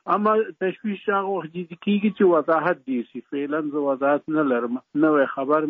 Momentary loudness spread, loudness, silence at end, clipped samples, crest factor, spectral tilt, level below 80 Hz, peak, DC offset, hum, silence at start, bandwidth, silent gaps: 10 LU; -23 LUFS; 0 s; under 0.1%; 14 dB; -5.5 dB/octave; -74 dBFS; -8 dBFS; under 0.1%; none; 0.05 s; 4.3 kHz; none